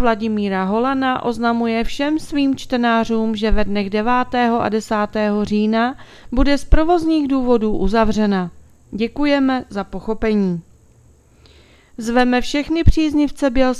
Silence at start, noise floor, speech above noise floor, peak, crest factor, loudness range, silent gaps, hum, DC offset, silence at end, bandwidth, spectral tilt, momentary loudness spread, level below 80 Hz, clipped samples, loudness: 0 s; -50 dBFS; 33 dB; 0 dBFS; 18 dB; 4 LU; none; none; under 0.1%; 0 s; 12.5 kHz; -6.5 dB/octave; 6 LU; -28 dBFS; under 0.1%; -18 LUFS